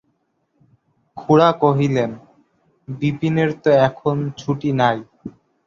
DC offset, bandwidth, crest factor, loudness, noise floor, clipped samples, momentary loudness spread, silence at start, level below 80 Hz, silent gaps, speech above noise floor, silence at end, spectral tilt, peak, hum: under 0.1%; 7.2 kHz; 18 dB; -18 LUFS; -68 dBFS; under 0.1%; 21 LU; 1.15 s; -56 dBFS; none; 50 dB; 0.35 s; -7.5 dB/octave; -2 dBFS; none